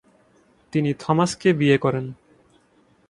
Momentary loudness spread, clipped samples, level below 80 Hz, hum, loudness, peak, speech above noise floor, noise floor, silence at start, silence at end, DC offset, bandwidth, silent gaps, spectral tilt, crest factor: 10 LU; under 0.1%; -60 dBFS; none; -21 LUFS; -4 dBFS; 39 dB; -60 dBFS; 0.75 s; 0.95 s; under 0.1%; 11.5 kHz; none; -6 dB/octave; 20 dB